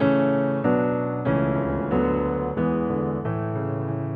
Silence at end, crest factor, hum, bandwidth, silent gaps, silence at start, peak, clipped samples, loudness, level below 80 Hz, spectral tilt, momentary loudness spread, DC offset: 0 s; 14 dB; none; 4.9 kHz; none; 0 s; -8 dBFS; under 0.1%; -24 LUFS; -42 dBFS; -11.5 dB/octave; 5 LU; under 0.1%